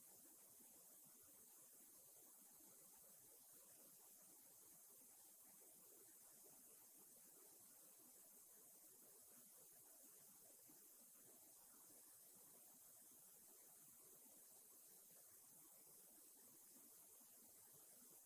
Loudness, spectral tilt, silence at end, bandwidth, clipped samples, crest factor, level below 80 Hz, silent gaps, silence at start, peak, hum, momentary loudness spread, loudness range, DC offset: -64 LUFS; -1 dB/octave; 0 s; 16 kHz; under 0.1%; 14 dB; under -90 dBFS; none; 0 s; -52 dBFS; none; 1 LU; 0 LU; under 0.1%